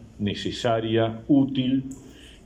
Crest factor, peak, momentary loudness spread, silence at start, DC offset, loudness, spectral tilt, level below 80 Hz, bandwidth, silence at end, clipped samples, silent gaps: 16 dB; -10 dBFS; 9 LU; 0 s; under 0.1%; -24 LUFS; -6.5 dB/octave; -52 dBFS; 9.6 kHz; 0.15 s; under 0.1%; none